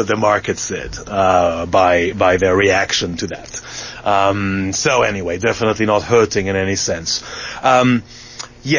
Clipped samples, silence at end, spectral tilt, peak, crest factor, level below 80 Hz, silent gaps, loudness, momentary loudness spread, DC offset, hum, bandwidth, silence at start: under 0.1%; 0 s; -4 dB/octave; -2 dBFS; 16 dB; -38 dBFS; none; -16 LUFS; 13 LU; under 0.1%; none; 7.4 kHz; 0 s